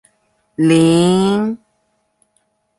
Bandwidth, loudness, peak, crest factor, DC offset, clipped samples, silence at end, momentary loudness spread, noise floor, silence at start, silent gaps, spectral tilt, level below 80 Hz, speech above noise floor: 11.5 kHz; -14 LUFS; -2 dBFS; 14 dB; under 0.1%; under 0.1%; 1.2 s; 18 LU; -65 dBFS; 0.6 s; none; -6 dB/octave; -54 dBFS; 52 dB